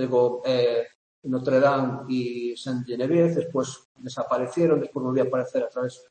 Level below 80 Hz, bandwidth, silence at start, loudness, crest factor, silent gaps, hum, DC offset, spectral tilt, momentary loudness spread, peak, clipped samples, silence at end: -72 dBFS; 8.8 kHz; 0 s; -25 LUFS; 16 dB; 0.95-1.22 s, 3.85-3.95 s; none; under 0.1%; -6.5 dB/octave; 11 LU; -8 dBFS; under 0.1%; 0.15 s